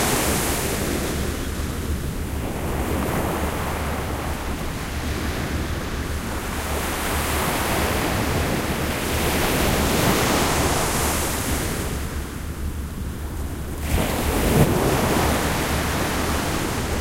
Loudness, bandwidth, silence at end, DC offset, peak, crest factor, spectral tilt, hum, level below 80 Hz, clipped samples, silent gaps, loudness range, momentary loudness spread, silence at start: -23 LUFS; 16 kHz; 0 s; under 0.1%; -2 dBFS; 20 dB; -4 dB/octave; none; -30 dBFS; under 0.1%; none; 5 LU; 9 LU; 0 s